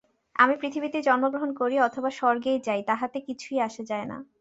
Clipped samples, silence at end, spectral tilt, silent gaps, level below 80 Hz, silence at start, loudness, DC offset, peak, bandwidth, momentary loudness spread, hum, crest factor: under 0.1%; 0.15 s; -4.5 dB/octave; none; -70 dBFS; 0.35 s; -26 LUFS; under 0.1%; -4 dBFS; 8 kHz; 11 LU; none; 22 dB